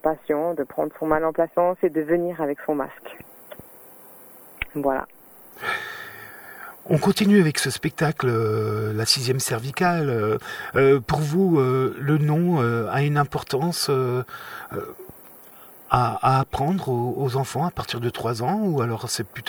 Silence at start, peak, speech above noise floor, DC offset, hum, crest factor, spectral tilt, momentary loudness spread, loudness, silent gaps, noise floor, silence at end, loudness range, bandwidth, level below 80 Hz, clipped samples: 0.05 s; 0 dBFS; 24 dB; under 0.1%; none; 22 dB; -5.5 dB/octave; 20 LU; -23 LUFS; none; -46 dBFS; 0 s; 9 LU; over 20 kHz; -52 dBFS; under 0.1%